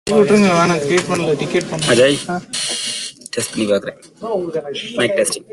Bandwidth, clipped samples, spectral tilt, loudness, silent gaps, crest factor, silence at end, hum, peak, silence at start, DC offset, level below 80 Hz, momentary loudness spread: 12.5 kHz; under 0.1%; -4 dB/octave; -17 LUFS; none; 16 dB; 0.1 s; none; -2 dBFS; 0.05 s; under 0.1%; -52 dBFS; 12 LU